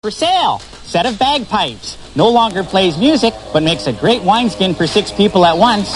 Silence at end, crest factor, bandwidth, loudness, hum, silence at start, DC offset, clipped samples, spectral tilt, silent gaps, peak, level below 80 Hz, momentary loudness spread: 0 s; 14 dB; 11.5 kHz; -13 LUFS; none; 0.05 s; 0.2%; under 0.1%; -5 dB/octave; none; 0 dBFS; -40 dBFS; 7 LU